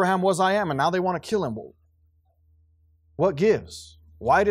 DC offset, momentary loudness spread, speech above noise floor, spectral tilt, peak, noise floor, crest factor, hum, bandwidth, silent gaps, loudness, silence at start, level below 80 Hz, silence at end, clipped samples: under 0.1%; 17 LU; 41 dB; -5.5 dB/octave; -8 dBFS; -63 dBFS; 16 dB; none; 15.5 kHz; none; -23 LUFS; 0 s; -56 dBFS; 0 s; under 0.1%